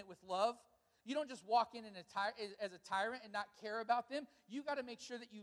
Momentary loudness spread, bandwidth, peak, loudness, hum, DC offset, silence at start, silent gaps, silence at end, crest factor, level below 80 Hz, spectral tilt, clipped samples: 12 LU; 12 kHz; -22 dBFS; -42 LUFS; none; under 0.1%; 0 s; none; 0 s; 20 dB; -86 dBFS; -3.5 dB/octave; under 0.1%